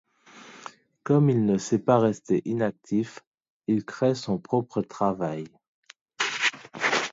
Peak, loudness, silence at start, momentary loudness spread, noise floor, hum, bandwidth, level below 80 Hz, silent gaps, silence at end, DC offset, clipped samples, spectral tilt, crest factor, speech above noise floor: -6 dBFS; -26 LUFS; 0.35 s; 17 LU; -50 dBFS; none; 7.8 kHz; -66 dBFS; 3.27-3.32 s, 3.50-3.60 s, 5.68-5.83 s, 6.01-6.06 s; 0 s; under 0.1%; under 0.1%; -5.5 dB/octave; 20 dB; 26 dB